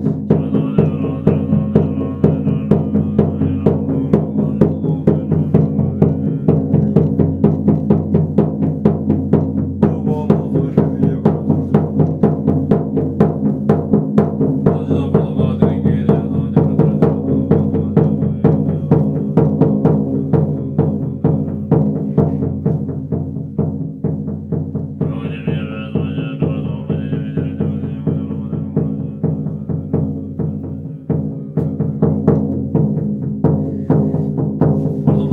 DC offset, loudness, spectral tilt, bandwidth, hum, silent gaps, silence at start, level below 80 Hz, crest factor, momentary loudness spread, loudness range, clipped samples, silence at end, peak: under 0.1%; -16 LUFS; -11.5 dB/octave; 3.8 kHz; none; none; 0 s; -42 dBFS; 16 dB; 7 LU; 6 LU; under 0.1%; 0 s; 0 dBFS